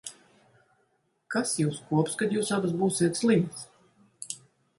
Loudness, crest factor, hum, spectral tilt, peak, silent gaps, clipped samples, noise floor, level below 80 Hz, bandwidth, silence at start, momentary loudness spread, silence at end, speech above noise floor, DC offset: -28 LUFS; 18 dB; none; -5 dB/octave; -12 dBFS; none; under 0.1%; -72 dBFS; -70 dBFS; 11.5 kHz; 0.05 s; 18 LU; 0.4 s; 46 dB; under 0.1%